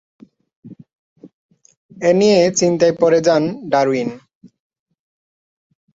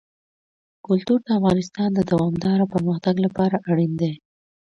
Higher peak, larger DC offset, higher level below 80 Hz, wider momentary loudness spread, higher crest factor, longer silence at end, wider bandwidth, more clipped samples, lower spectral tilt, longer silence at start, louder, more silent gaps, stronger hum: first, -2 dBFS vs -6 dBFS; neither; second, -62 dBFS vs -54 dBFS; first, 7 LU vs 4 LU; about the same, 16 dB vs 16 dB; first, 1.75 s vs 0.55 s; about the same, 8 kHz vs 7.6 kHz; neither; second, -5 dB/octave vs -8 dB/octave; second, 0.65 s vs 0.9 s; first, -15 LUFS vs -21 LUFS; first, 0.95-1.16 s, 1.33-1.49 s, 1.77-1.89 s vs none; neither